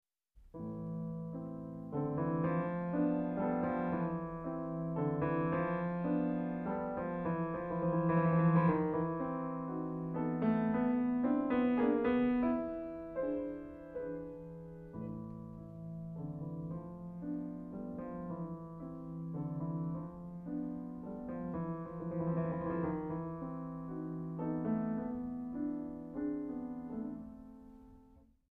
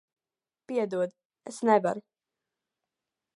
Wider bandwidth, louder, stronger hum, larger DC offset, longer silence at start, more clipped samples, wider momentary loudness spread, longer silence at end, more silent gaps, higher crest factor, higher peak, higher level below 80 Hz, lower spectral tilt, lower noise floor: second, 4 kHz vs 11.5 kHz; second, -37 LUFS vs -29 LUFS; neither; neither; second, 0.35 s vs 0.7 s; neither; second, 14 LU vs 17 LU; second, 0.35 s vs 1.35 s; second, none vs 1.25-1.30 s; second, 18 dB vs 24 dB; second, -18 dBFS vs -8 dBFS; first, -62 dBFS vs -84 dBFS; first, -11.5 dB/octave vs -6 dB/octave; second, -63 dBFS vs under -90 dBFS